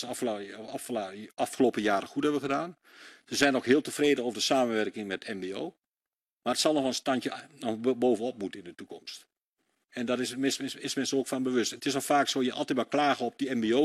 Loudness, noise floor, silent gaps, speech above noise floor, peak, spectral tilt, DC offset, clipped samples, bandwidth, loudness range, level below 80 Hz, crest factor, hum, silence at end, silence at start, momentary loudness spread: -29 LUFS; under -90 dBFS; 6.32-6.37 s, 9.42-9.53 s; over 61 dB; -10 dBFS; -3.5 dB/octave; under 0.1%; under 0.1%; 14 kHz; 5 LU; -72 dBFS; 20 dB; none; 0 s; 0 s; 13 LU